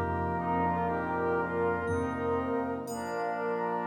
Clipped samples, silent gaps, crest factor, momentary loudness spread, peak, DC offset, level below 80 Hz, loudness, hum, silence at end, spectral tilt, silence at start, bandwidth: under 0.1%; none; 12 dB; 4 LU; -18 dBFS; under 0.1%; -54 dBFS; -31 LUFS; none; 0 s; -7 dB/octave; 0 s; 17 kHz